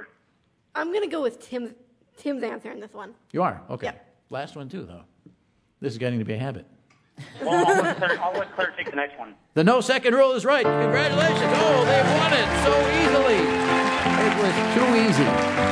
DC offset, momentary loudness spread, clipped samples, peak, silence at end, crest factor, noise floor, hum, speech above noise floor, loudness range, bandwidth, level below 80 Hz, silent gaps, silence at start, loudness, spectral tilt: under 0.1%; 16 LU; under 0.1%; -6 dBFS; 0 s; 18 dB; -67 dBFS; none; 44 dB; 13 LU; 11 kHz; -48 dBFS; none; 0 s; -21 LUFS; -5 dB/octave